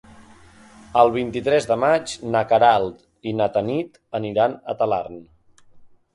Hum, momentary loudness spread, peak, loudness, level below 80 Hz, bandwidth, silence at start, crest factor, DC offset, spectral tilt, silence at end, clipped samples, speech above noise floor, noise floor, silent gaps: none; 13 LU; -2 dBFS; -21 LUFS; -54 dBFS; 11.5 kHz; 0.2 s; 20 dB; under 0.1%; -5.5 dB/octave; 0.3 s; under 0.1%; 29 dB; -49 dBFS; none